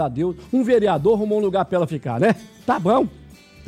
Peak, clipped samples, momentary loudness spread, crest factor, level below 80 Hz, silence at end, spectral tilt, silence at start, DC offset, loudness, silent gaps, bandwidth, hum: -8 dBFS; under 0.1%; 7 LU; 12 dB; -50 dBFS; 0.35 s; -7.5 dB/octave; 0 s; under 0.1%; -20 LUFS; none; 14 kHz; none